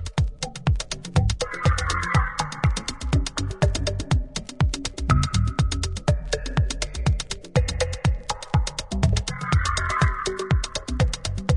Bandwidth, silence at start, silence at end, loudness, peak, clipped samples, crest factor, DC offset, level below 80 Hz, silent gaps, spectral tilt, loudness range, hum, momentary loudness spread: 11 kHz; 0 s; 0 s; -25 LUFS; -4 dBFS; under 0.1%; 18 dB; under 0.1%; -30 dBFS; none; -5 dB/octave; 1 LU; none; 5 LU